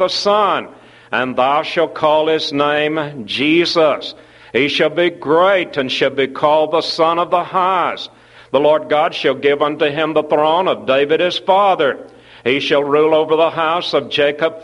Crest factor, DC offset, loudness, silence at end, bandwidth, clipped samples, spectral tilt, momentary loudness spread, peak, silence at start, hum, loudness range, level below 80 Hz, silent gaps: 16 dB; under 0.1%; -15 LUFS; 0 s; 11.5 kHz; under 0.1%; -5 dB/octave; 7 LU; 0 dBFS; 0 s; none; 1 LU; -60 dBFS; none